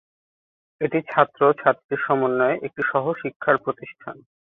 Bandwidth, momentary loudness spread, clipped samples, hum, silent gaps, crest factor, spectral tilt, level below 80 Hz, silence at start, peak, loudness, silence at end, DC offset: 4 kHz; 14 LU; under 0.1%; none; 1.84-1.89 s, 3.36-3.40 s; 22 dB; -9.5 dB/octave; -66 dBFS; 0.8 s; -2 dBFS; -22 LUFS; 0.4 s; under 0.1%